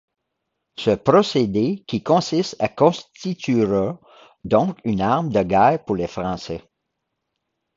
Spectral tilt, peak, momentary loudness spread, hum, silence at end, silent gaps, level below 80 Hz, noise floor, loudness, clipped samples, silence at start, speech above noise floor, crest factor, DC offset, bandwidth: -6.5 dB/octave; 0 dBFS; 13 LU; none; 1.15 s; none; -50 dBFS; -78 dBFS; -20 LUFS; under 0.1%; 0.8 s; 58 dB; 20 dB; under 0.1%; 7.8 kHz